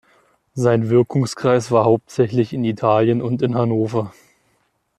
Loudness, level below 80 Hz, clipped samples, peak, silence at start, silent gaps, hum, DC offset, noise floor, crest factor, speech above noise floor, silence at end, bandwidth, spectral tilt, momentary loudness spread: -18 LUFS; -58 dBFS; under 0.1%; -2 dBFS; 0.55 s; none; none; under 0.1%; -65 dBFS; 16 dB; 48 dB; 0.9 s; 11.5 kHz; -7.5 dB/octave; 6 LU